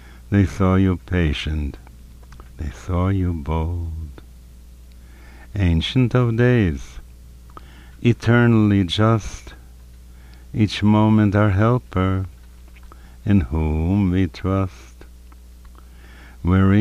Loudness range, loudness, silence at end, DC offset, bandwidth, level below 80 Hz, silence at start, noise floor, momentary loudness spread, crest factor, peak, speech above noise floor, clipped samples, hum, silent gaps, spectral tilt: 7 LU; -19 LUFS; 0 s; under 0.1%; 10.5 kHz; -34 dBFS; 0.05 s; -42 dBFS; 16 LU; 16 dB; -4 dBFS; 24 dB; under 0.1%; none; none; -7.5 dB/octave